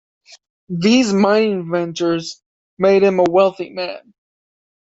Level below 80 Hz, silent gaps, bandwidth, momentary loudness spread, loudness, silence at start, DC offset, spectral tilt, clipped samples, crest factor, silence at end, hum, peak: -60 dBFS; 2.46-2.77 s; 8 kHz; 14 LU; -16 LUFS; 0.7 s; under 0.1%; -5.5 dB/octave; under 0.1%; 16 dB; 0.9 s; none; -2 dBFS